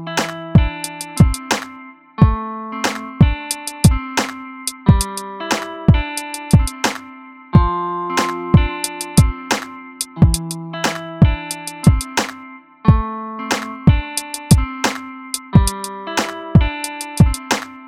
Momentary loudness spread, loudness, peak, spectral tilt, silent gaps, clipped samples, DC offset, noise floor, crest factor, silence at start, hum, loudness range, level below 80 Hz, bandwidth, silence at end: 11 LU; -18 LUFS; 0 dBFS; -5 dB/octave; none; under 0.1%; under 0.1%; -39 dBFS; 18 dB; 0 s; none; 1 LU; -24 dBFS; 17 kHz; 0 s